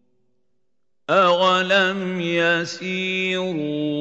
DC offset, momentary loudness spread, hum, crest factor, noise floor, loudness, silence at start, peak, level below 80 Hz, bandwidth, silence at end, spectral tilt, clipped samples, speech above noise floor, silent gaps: under 0.1%; 9 LU; none; 18 dB; -78 dBFS; -20 LUFS; 1.1 s; -4 dBFS; -74 dBFS; 8.2 kHz; 0 s; -4.5 dB/octave; under 0.1%; 58 dB; none